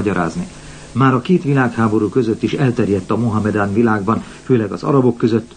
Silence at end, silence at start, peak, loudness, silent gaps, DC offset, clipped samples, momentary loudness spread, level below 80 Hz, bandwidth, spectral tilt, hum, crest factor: 0.1 s; 0 s; -2 dBFS; -16 LUFS; none; 0.2%; under 0.1%; 7 LU; -46 dBFS; 9.6 kHz; -8 dB/octave; none; 14 dB